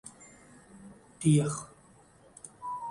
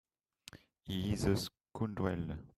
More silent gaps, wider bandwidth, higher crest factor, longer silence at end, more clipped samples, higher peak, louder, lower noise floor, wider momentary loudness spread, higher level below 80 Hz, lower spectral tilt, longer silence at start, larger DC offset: neither; second, 11.5 kHz vs 14 kHz; about the same, 20 dB vs 20 dB; about the same, 0 s vs 0.1 s; neither; first, -14 dBFS vs -20 dBFS; first, -30 LUFS vs -38 LUFS; about the same, -59 dBFS vs -60 dBFS; first, 27 LU vs 22 LU; second, -64 dBFS vs -56 dBFS; about the same, -6.5 dB/octave vs -6 dB/octave; second, 0.05 s vs 0.55 s; neither